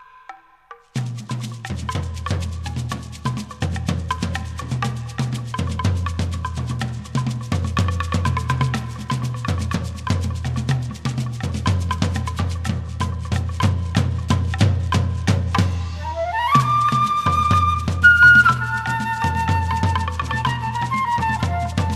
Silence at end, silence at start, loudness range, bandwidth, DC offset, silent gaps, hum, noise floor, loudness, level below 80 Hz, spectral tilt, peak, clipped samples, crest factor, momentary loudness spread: 0 s; 0 s; 11 LU; 13 kHz; under 0.1%; none; none; -46 dBFS; -21 LUFS; -34 dBFS; -5.5 dB/octave; -2 dBFS; under 0.1%; 18 dB; 10 LU